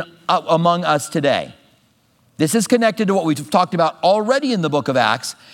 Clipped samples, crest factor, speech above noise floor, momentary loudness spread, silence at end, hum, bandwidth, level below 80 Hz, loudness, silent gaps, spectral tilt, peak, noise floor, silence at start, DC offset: under 0.1%; 18 dB; 41 dB; 4 LU; 0.2 s; none; 18 kHz; -68 dBFS; -17 LUFS; none; -5 dB/octave; 0 dBFS; -58 dBFS; 0 s; under 0.1%